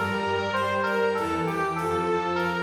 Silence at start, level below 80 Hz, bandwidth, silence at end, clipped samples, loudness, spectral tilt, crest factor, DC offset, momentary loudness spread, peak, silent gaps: 0 s; -56 dBFS; 17.5 kHz; 0 s; under 0.1%; -26 LUFS; -5.5 dB/octave; 12 dB; under 0.1%; 2 LU; -14 dBFS; none